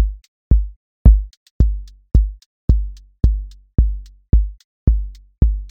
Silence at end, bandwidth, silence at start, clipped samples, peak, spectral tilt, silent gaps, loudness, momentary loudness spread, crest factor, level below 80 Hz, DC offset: 0 s; 1.3 kHz; 0 s; under 0.1%; 0 dBFS; -10.5 dB/octave; 0.28-0.51 s, 0.76-1.05 s, 1.37-1.60 s, 2.46-2.68 s, 4.64-4.87 s; -20 LUFS; 17 LU; 16 dB; -18 dBFS; under 0.1%